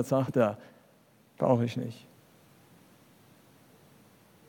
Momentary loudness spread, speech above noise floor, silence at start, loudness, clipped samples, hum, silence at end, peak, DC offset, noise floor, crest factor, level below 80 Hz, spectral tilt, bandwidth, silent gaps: 17 LU; 34 dB; 0 s; -29 LUFS; under 0.1%; none; 2.5 s; -12 dBFS; under 0.1%; -62 dBFS; 22 dB; -78 dBFS; -7.5 dB/octave; 18 kHz; none